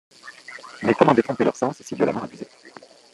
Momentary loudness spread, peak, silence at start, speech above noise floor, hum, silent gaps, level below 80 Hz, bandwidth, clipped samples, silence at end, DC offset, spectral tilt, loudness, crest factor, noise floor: 23 LU; -2 dBFS; 0.25 s; 26 dB; none; none; -64 dBFS; 12 kHz; under 0.1%; 0.45 s; under 0.1%; -6.5 dB/octave; -21 LUFS; 22 dB; -47 dBFS